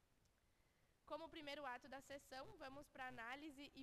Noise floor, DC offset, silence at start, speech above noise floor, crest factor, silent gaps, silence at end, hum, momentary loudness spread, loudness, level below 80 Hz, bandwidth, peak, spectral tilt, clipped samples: -80 dBFS; under 0.1%; 0 s; 25 dB; 20 dB; none; 0 s; none; 6 LU; -55 LUFS; -78 dBFS; 13 kHz; -38 dBFS; -3.5 dB/octave; under 0.1%